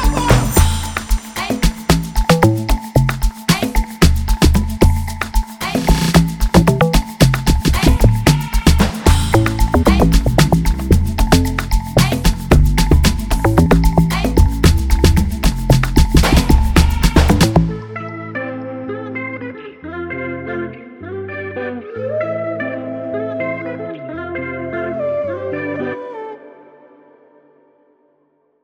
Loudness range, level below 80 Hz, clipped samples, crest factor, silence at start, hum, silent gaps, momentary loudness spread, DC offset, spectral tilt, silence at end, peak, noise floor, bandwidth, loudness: 11 LU; -18 dBFS; under 0.1%; 14 dB; 0 s; none; none; 13 LU; under 0.1%; -5.5 dB/octave; 2.15 s; 0 dBFS; -60 dBFS; 20 kHz; -16 LUFS